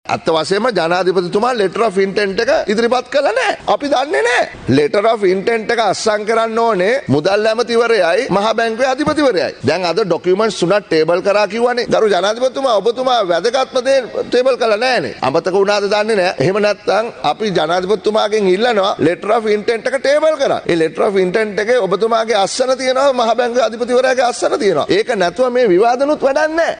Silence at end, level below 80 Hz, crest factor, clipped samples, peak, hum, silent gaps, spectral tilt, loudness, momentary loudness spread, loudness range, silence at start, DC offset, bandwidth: 0 s; -52 dBFS; 12 dB; under 0.1%; -2 dBFS; none; none; -4.5 dB/octave; -14 LUFS; 3 LU; 1 LU; 0.05 s; under 0.1%; 10 kHz